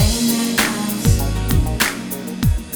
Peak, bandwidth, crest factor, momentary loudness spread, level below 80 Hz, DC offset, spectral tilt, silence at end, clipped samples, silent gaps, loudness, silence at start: 0 dBFS; over 20 kHz; 16 dB; 4 LU; -24 dBFS; under 0.1%; -4 dB/octave; 0 s; under 0.1%; none; -18 LUFS; 0 s